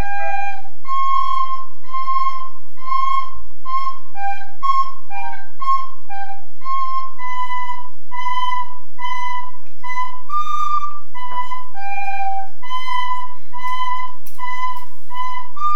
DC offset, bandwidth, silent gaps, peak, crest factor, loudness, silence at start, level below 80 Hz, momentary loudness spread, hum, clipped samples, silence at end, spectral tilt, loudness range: 40%; 16.5 kHz; none; -2 dBFS; 16 dB; -24 LUFS; 0 s; -54 dBFS; 12 LU; none; under 0.1%; 0 s; -4 dB/octave; 3 LU